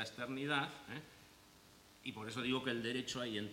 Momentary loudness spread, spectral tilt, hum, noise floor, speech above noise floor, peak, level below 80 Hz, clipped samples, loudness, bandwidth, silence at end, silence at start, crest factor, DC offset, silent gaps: 16 LU; -4 dB/octave; none; -64 dBFS; 22 dB; -22 dBFS; -74 dBFS; under 0.1%; -41 LUFS; 16.5 kHz; 0 s; 0 s; 20 dB; under 0.1%; none